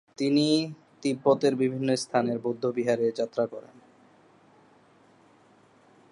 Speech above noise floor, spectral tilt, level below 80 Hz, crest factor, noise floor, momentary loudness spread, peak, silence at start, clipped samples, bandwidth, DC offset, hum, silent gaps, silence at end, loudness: 33 dB; -5.5 dB/octave; -78 dBFS; 20 dB; -59 dBFS; 9 LU; -10 dBFS; 0.2 s; under 0.1%; 11.5 kHz; under 0.1%; none; none; 2.5 s; -27 LUFS